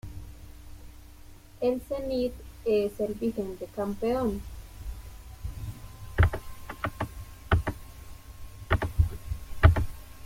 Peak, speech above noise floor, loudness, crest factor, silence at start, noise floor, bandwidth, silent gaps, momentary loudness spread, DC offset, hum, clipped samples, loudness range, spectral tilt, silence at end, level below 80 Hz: -4 dBFS; 20 dB; -30 LUFS; 26 dB; 0.05 s; -49 dBFS; 16.5 kHz; none; 21 LU; under 0.1%; none; under 0.1%; 4 LU; -7.5 dB/octave; 0 s; -36 dBFS